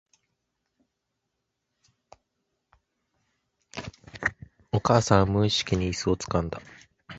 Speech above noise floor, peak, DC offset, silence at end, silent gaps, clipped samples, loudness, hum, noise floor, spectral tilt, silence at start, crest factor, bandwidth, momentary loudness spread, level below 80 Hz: 57 dB; -2 dBFS; under 0.1%; 0 s; none; under 0.1%; -25 LUFS; none; -81 dBFS; -5 dB/octave; 3.75 s; 26 dB; 8.2 kHz; 19 LU; -46 dBFS